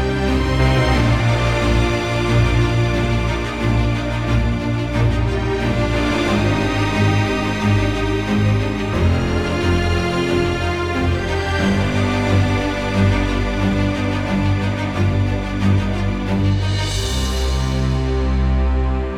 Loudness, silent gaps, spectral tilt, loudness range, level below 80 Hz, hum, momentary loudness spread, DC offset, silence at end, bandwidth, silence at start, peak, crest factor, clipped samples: -18 LUFS; none; -6.5 dB/octave; 2 LU; -24 dBFS; none; 4 LU; 0.2%; 0 s; 12.5 kHz; 0 s; -4 dBFS; 12 dB; under 0.1%